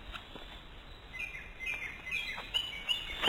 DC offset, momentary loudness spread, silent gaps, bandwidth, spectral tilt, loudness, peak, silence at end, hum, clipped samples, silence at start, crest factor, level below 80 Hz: under 0.1%; 16 LU; none; 16.5 kHz; -1.5 dB/octave; -37 LUFS; -14 dBFS; 0 s; none; under 0.1%; 0 s; 26 dB; -52 dBFS